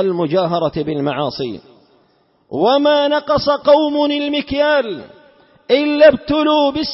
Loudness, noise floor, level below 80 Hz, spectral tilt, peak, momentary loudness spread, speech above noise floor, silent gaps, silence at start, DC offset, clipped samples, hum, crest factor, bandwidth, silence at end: -15 LUFS; -57 dBFS; -46 dBFS; -8.5 dB/octave; 0 dBFS; 13 LU; 42 dB; none; 0 s; under 0.1%; under 0.1%; none; 16 dB; 5.8 kHz; 0 s